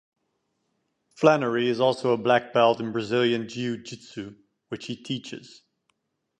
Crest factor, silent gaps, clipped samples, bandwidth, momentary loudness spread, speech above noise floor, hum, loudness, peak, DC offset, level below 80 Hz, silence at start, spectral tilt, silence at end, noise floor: 22 dB; none; under 0.1%; 9.2 kHz; 18 LU; 51 dB; none; -24 LUFS; -4 dBFS; under 0.1%; -70 dBFS; 1.2 s; -5.5 dB/octave; 0.95 s; -76 dBFS